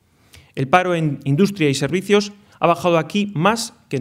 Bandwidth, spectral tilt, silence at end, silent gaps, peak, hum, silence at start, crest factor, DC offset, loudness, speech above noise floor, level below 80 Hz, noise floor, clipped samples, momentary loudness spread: 16 kHz; -5.5 dB/octave; 0 s; none; 0 dBFS; none; 0.55 s; 18 dB; under 0.1%; -18 LUFS; 32 dB; -58 dBFS; -49 dBFS; under 0.1%; 9 LU